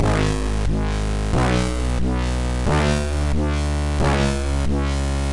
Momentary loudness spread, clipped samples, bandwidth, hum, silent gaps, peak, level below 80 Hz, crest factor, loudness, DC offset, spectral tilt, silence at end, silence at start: 4 LU; under 0.1%; 11.5 kHz; none; none; -10 dBFS; -24 dBFS; 10 dB; -22 LUFS; under 0.1%; -6 dB/octave; 0 s; 0 s